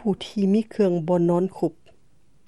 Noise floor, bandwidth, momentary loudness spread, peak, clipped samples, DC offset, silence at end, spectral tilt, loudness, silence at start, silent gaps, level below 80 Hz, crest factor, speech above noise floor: -63 dBFS; 11.5 kHz; 7 LU; -8 dBFS; under 0.1%; 0.3%; 0.75 s; -8.5 dB/octave; -23 LUFS; 0.05 s; none; -62 dBFS; 14 dB; 41 dB